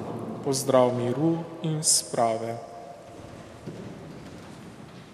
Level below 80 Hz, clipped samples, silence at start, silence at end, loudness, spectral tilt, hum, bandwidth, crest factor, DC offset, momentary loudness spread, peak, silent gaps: -62 dBFS; under 0.1%; 0 s; 0 s; -25 LUFS; -4 dB/octave; none; 15.5 kHz; 22 dB; under 0.1%; 22 LU; -6 dBFS; none